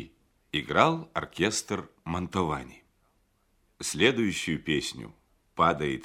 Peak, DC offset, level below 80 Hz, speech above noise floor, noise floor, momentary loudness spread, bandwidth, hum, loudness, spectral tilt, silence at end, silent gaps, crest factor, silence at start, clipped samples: -6 dBFS; under 0.1%; -54 dBFS; 41 dB; -69 dBFS; 16 LU; 16 kHz; none; -28 LUFS; -4 dB/octave; 0 s; none; 24 dB; 0 s; under 0.1%